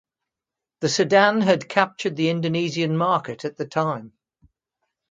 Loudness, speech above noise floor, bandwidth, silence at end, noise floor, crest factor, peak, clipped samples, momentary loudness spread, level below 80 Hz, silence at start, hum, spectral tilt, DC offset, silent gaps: -21 LUFS; 66 dB; 9.4 kHz; 1 s; -87 dBFS; 22 dB; 0 dBFS; under 0.1%; 11 LU; -68 dBFS; 0.8 s; none; -5 dB/octave; under 0.1%; none